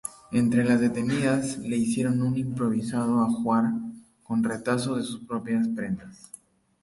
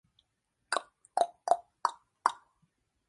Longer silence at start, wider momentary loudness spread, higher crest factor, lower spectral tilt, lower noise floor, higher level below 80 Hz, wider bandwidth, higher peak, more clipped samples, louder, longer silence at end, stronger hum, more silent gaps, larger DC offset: second, 0.05 s vs 0.7 s; first, 10 LU vs 5 LU; second, 14 dB vs 28 dB; first, -6 dB/octave vs 0 dB/octave; second, -51 dBFS vs -80 dBFS; first, -60 dBFS vs -84 dBFS; about the same, 11.5 kHz vs 11.5 kHz; second, -12 dBFS vs -8 dBFS; neither; first, -26 LUFS vs -34 LUFS; about the same, 0.65 s vs 0.75 s; neither; neither; neither